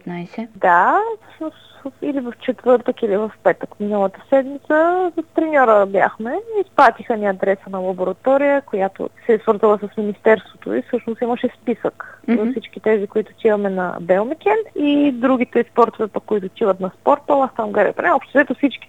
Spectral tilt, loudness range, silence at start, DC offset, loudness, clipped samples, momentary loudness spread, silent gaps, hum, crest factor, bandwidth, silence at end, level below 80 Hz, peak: -7.5 dB/octave; 4 LU; 0.05 s; 0.2%; -18 LUFS; under 0.1%; 10 LU; none; none; 18 dB; 9.2 kHz; 0.05 s; -66 dBFS; 0 dBFS